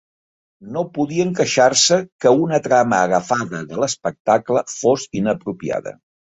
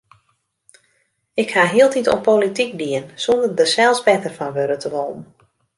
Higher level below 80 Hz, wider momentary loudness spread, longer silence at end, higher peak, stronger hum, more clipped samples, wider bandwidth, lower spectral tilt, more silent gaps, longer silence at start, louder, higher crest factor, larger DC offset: about the same, -58 dBFS vs -60 dBFS; about the same, 11 LU vs 11 LU; second, 0.4 s vs 0.55 s; about the same, 0 dBFS vs -2 dBFS; neither; neither; second, 8.4 kHz vs 11.5 kHz; about the same, -3.5 dB/octave vs -3.5 dB/octave; first, 2.12-2.19 s, 4.20-4.25 s vs none; second, 0.6 s vs 1.35 s; about the same, -18 LUFS vs -18 LUFS; about the same, 18 dB vs 18 dB; neither